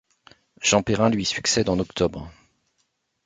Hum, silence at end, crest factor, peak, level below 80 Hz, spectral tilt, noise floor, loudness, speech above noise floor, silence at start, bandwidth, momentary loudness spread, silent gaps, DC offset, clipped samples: none; 0.95 s; 22 dB; -4 dBFS; -48 dBFS; -3.5 dB/octave; -72 dBFS; -22 LUFS; 50 dB; 0.6 s; 9.6 kHz; 8 LU; none; under 0.1%; under 0.1%